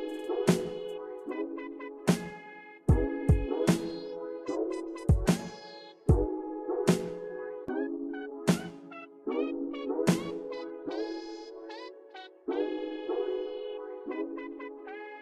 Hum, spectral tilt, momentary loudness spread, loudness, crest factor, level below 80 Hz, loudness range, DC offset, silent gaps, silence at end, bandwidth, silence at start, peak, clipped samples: none; -6.5 dB/octave; 15 LU; -32 LUFS; 20 dB; -42 dBFS; 6 LU; under 0.1%; none; 0 s; 15 kHz; 0 s; -12 dBFS; under 0.1%